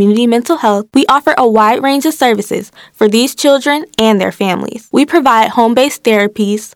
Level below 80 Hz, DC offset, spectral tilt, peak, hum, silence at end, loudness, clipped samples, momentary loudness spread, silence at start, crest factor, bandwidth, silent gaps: -52 dBFS; under 0.1%; -4.5 dB/octave; 0 dBFS; none; 0.1 s; -11 LUFS; 0.3%; 7 LU; 0 s; 10 dB; 18 kHz; none